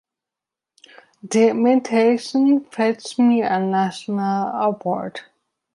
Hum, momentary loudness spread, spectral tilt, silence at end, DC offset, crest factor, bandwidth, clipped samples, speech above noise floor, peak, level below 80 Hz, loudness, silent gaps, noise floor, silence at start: none; 8 LU; -6 dB/octave; 0.55 s; under 0.1%; 16 dB; 11.5 kHz; under 0.1%; 69 dB; -4 dBFS; -72 dBFS; -19 LUFS; none; -87 dBFS; 1.25 s